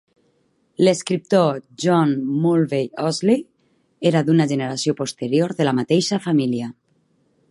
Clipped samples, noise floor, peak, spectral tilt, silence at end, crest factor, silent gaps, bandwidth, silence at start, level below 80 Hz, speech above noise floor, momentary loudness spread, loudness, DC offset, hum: under 0.1%; -64 dBFS; -4 dBFS; -6 dB/octave; 0.8 s; 16 dB; none; 11.5 kHz; 0.8 s; -68 dBFS; 45 dB; 6 LU; -20 LUFS; under 0.1%; none